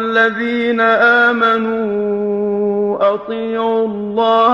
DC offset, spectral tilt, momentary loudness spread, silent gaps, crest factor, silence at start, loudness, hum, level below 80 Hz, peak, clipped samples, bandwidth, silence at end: under 0.1%; -6.5 dB/octave; 7 LU; none; 14 dB; 0 s; -15 LUFS; none; -56 dBFS; 0 dBFS; under 0.1%; 7 kHz; 0 s